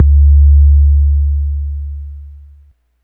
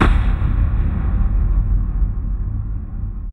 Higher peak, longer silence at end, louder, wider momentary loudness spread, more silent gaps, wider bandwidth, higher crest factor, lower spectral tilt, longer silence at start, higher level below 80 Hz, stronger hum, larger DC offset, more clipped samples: about the same, 0 dBFS vs 0 dBFS; first, 0.7 s vs 0 s; first, -11 LUFS vs -21 LUFS; first, 18 LU vs 8 LU; neither; second, 0.2 kHz vs 4.2 kHz; second, 10 dB vs 16 dB; first, -13 dB/octave vs -8.5 dB/octave; about the same, 0 s vs 0 s; first, -10 dBFS vs -18 dBFS; neither; neither; neither